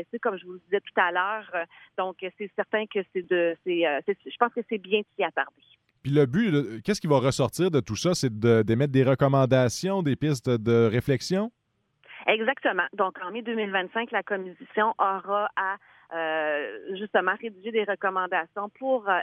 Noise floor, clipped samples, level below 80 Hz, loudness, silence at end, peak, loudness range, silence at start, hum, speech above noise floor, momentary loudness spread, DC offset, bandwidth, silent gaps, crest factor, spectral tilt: -64 dBFS; under 0.1%; -62 dBFS; -26 LUFS; 0 s; -6 dBFS; 5 LU; 0 s; none; 38 dB; 10 LU; under 0.1%; 15 kHz; none; 20 dB; -6 dB/octave